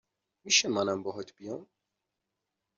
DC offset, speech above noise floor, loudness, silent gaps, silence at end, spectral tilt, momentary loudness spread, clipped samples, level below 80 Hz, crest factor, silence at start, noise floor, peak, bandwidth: under 0.1%; 55 dB; -28 LUFS; none; 1.15 s; -1.5 dB/octave; 18 LU; under 0.1%; -78 dBFS; 26 dB; 0.45 s; -86 dBFS; -8 dBFS; 7.4 kHz